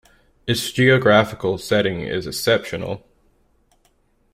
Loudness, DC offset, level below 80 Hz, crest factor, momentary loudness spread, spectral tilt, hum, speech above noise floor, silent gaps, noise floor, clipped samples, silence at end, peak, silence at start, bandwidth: -19 LUFS; under 0.1%; -52 dBFS; 18 dB; 14 LU; -5 dB/octave; none; 43 dB; none; -61 dBFS; under 0.1%; 1.35 s; -2 dBFS; 0.45 s; 16 kHz